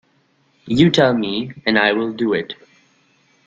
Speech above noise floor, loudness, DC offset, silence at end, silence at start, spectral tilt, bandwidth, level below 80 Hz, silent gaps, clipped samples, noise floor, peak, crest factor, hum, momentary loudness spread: 43 dB; -17 LUFS; under 0.1%; 0.95 s; 0.65 s; -6 dB/octave; 7.8 kHz; -54 dBFS; none; under 0.1%; -60 dBFS; -2 dBFS; 18 dB; none; 10 LU